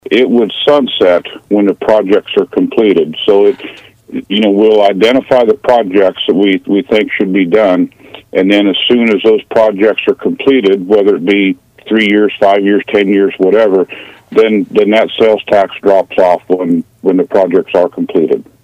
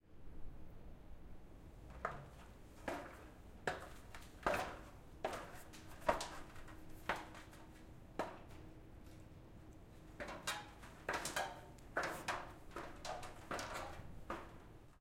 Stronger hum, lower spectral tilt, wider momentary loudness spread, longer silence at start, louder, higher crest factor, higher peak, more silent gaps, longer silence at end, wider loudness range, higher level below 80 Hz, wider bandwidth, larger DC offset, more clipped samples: neither; first, -6.5 dB/octave vs -3.5 dB/octave; second, 5 LU vs 18 LU; about the same, 0.1 s vs 0.05 s; first, -10 LUFS vs -46 LUFS; second, 10 dB vs 30 dB; first, 0 dBFS vs -18 dBFS; neither; first, 0.2 s vs 0 s; second, 1 LU vs 6 LU; first, -52 dBFS vs -60 dBFS; second, 8.4 kHz vs 16.5 kHz; neither; first, 2% vs under 0.1%